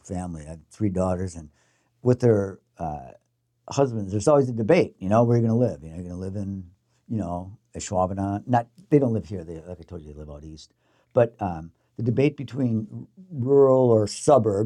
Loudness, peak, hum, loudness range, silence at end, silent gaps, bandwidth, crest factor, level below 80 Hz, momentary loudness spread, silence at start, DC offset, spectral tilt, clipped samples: -23 LUFS; -6 dBFS; none; 5 LU; 0 s; none; 11 kHz; 18 dB; -56 dBFS; 20 LU; 0.05 s; under 0.1%; -7.5 dB/octave; under 0.1%